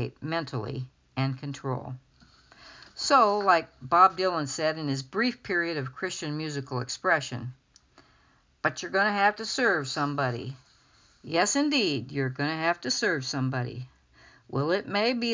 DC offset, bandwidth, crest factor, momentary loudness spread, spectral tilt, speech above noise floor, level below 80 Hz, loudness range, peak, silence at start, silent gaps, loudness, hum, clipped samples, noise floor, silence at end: under 0.1%; 7.8 kHz; 22 dB; 15 LU; -4 dB/octave; 36 dB; -64 dBFS; 5 LU; -6 dBFS; 0 s; none; -27 LUFS; none; under 0.1%; -64 dBFS; 0 s